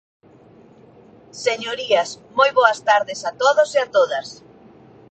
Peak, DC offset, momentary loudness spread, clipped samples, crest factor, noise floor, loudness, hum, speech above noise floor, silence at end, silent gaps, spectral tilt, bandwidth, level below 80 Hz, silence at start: -2 dBFS; under 0.1%; 11 LU; under 0.1%; 20 dB; -48 dBFS; -19 LUFS; none; 30 dB; 0.8 s; none; -1.5 dB/octave; 9 kHz; -68 dBFS; 1.35 s